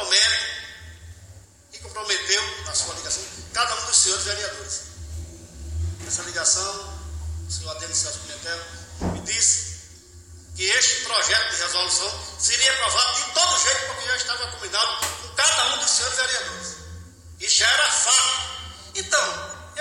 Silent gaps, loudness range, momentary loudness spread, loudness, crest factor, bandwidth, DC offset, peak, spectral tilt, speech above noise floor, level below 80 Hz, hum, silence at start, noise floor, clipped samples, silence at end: none; 6 LU; 18 LU; -21 LUFS; 20 dB; 17 kHz; under 0.1%; -4 dBFS; 0 dB/octave; 23 dB; -44 dBFS; none; 0 s; -47 dBFS; under 0.1%; 0 s